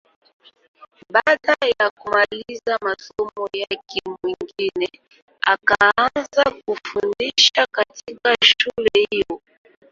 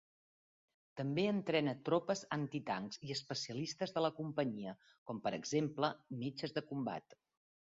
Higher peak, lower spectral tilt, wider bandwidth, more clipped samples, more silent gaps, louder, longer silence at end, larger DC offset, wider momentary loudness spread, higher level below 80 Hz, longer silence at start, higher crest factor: first, 0 dBFS vs -20 dBFS; second, -1.5 dB/octave vs -4.5 dB/octave; about the same, 7.6 kHz vs 7.6 kHz; neither; about the same, 1.91-1.97 s, 5.22-5.28 s vs 4.98-5.06 s; first, -19 LUFS vs -40 LUFS; second, 0.55 s vs 0.75 s; neither; first, 13 LU vs 8 LU; first, -58 dBFS vs -80 dBFS; first, 1.1 s vs 0.95 s; about the same, 20 dB vs 20 dB